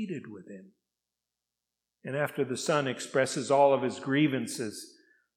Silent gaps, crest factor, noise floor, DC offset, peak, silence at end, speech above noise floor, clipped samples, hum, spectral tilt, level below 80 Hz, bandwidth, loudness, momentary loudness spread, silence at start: none; 20 dB; -88 dBFS; under 0.1%; -10 dBFS; 0.5 s; 59 dB; under 0.1%; none; -5 dB/octave; -84 dBFS; 16 kHz; -29 LUFS; 22 LU; 0 s